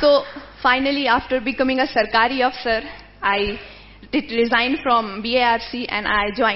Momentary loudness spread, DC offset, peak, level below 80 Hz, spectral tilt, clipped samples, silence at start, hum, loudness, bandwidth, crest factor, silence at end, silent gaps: 8 LU; under 0.1%; -2 dBFS; -46 dBFS; -7 dB/octave; under 0.1%; 0 s; 50 Hz at -50 dBFS; -19 LUFS; 6 kHz; 18 dB; 0 s; none